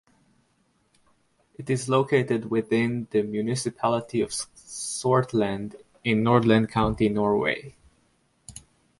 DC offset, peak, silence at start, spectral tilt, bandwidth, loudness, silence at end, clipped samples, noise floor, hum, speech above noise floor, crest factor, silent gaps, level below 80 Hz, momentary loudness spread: under 0.1%; -6 dBFS; 1.6 s; -5.5 dB/octave; 11.5 kHz; -25 LUFS; 0.4 s; under 0.1%; -68 dBFS; none; 44 dB; 20 dB; none; -52 dBFS; 13 LU